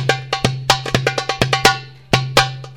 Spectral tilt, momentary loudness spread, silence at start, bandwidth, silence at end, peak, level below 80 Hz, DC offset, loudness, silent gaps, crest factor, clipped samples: -3.5 dB/octave; 6 LU; 0 s; 19.5 kHz; 0 s; 0 dBFS; -40 dBFS; 0.3%; -17 LUFS; none; 18 dB; under 0.1%